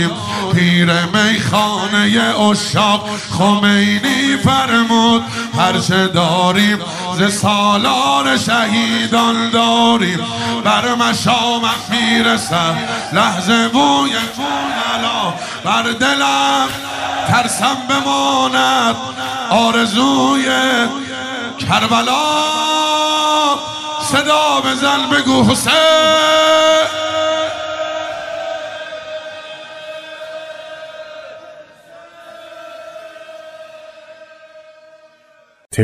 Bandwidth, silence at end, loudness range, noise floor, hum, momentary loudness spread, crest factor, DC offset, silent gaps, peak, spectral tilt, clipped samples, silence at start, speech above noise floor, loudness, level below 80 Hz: 15.5 kHz; 0 s; 14 LU; -50 dBFS; none; 17 LU; 14 dB; under 0.1%; none; -2 dBFS; -3.5 dB/octave; under 0.1%; 0 s; 37 dB; -13 LUFS; -52 dBFS